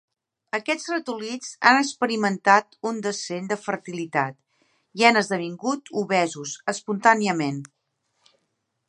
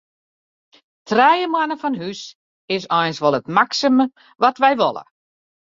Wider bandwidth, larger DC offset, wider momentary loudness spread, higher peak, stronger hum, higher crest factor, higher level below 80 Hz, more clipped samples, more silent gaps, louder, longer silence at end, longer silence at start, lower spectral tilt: first, 11.5 kHz vs 7.6 kHz; neither; about the same, 13 LU vs 12 LU; about the same, 0 dBFS vs -2 dBFS; neither; first, 24 dB vs 18 dB; second, -78 dBFS vs -66 dBFS; neither; second, none vs 2.35-2.68 s; second, -23 LUFS vs -18 LUFS; first, 1.25 s vs 0.75 s; second, 0.55 s vs 1.05 s; about the same, -4 dB/octave vs -4.5 dB/octave